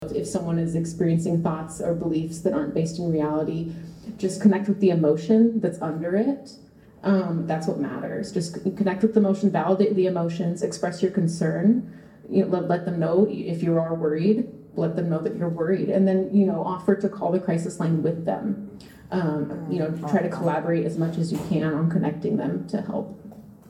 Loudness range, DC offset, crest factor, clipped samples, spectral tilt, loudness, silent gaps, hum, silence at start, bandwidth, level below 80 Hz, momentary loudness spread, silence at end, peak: 4 LU; under 0.1%; 18 dB; under 0.1%; -8 dB/octave; -24 LUFS; none; none; 0 s; 11.5 kHz; -58 dBFS; 8 LU; 0.15 s; -6 dBFS